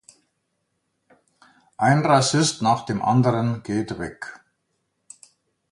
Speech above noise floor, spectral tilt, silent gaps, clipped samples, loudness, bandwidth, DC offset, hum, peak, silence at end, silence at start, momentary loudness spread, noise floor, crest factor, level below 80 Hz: 54 dB; -5 dB/octave; none; under 0.1%; -21 LUFS; 11.5 kHz; under 0.1%; none; -2 dBFS; 1.35 s; 1.8 s; 15 LU; -74 dBFS; 22 dB; -58 dBFS